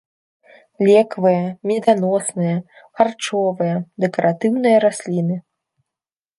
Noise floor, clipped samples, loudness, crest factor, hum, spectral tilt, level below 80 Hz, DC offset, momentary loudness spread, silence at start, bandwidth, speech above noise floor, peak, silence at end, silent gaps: -88 dBFS; under 0.1%; -18 LUFS; 18 dB; none; -6 dB/octave; -68 dBFS; under 0.1%; 8 LU; 0.8 s; 11.5 kHz; 71 dB; 0 dBFS; 1 s; none